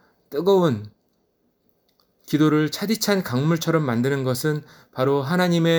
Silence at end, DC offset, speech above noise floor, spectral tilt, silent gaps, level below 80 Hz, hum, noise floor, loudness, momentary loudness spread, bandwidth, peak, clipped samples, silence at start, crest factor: 0 s; under 0.1%; 47 dB; -6 dB/octave; none; -66 dBFS; none; -68 dBFS; -22 LUFS; 8 LU; over 20 kHz; -4 dBFS; under 0.1%; 0.3 s; 18 dB